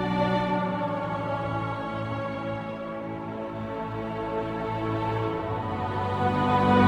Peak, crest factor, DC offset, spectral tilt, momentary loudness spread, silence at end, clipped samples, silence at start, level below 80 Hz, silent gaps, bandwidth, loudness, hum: -8 dBFS; 18 dB; under 0.1%; -8 dB/octave; 9 LU; 0 s; under 0.1%; 0 s; -50 dBFS; none; 16 kHz; -29 LUFS; none